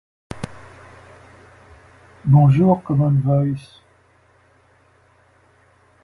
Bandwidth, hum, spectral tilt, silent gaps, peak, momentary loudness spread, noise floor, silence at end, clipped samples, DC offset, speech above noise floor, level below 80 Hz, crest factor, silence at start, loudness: 4.8 kHz; none; -10 dB/octave; none; -2 dBFS; 20 LU; -56 dBFS; 2.45 s; under 0.1%; under 0.1%; 41 dB; -50 dBFS; 18 dB; 0.3 s; -17 LUFS